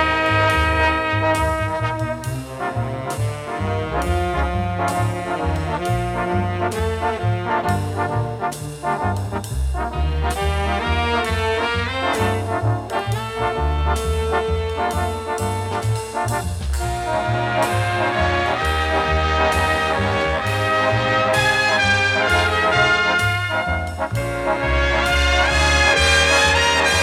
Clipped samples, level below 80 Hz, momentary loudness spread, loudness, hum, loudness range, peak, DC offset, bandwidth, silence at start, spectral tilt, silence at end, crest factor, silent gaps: under 0.1%; -30 dBFS; 9 LU; -19 LUFS; none; 6 LU; -2 dBFS; under 0.1%; 15.5 kHz; 0 s; -4.5 dB/octave; 0 s; 16 dB; none